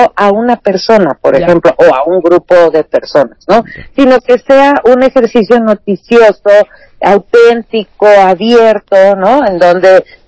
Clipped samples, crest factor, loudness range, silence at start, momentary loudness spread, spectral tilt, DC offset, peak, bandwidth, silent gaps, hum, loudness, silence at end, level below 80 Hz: 10%; 6 dB; 1 LU; 0 s; 6 LU; -6 dB/octave; under 0.1%; 0 dBFS; 8 kHz; none; none; -7 LUFS; 0.25 s; -42 dBFS